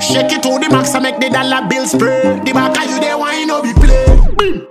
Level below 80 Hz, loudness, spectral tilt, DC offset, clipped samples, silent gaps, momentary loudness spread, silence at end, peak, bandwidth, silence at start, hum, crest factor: -14 dBFS; -12 LUFS; -4.5 dB/octave; under 0.1%; 0.3%; none; 4 LU; 0.05 s; 0 dBFS; 14.5 kHz; 0 s; none; 10 dB